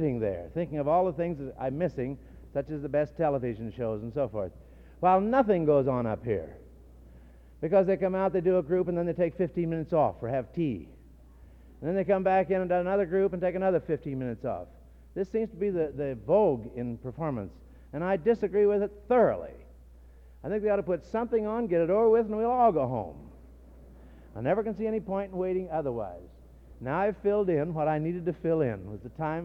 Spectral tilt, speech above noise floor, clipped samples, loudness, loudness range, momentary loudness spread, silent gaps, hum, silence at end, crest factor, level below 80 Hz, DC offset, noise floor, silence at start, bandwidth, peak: -10 dB/octave; 25 dB; under 0.1%; -29 LUFS; 4 LU; 12 LU; none; none; 0 s; 18 dB; -52 dBFS; under 0.1%; -52 dBFS; 0 s; 6.2 kHz; -12 dBFS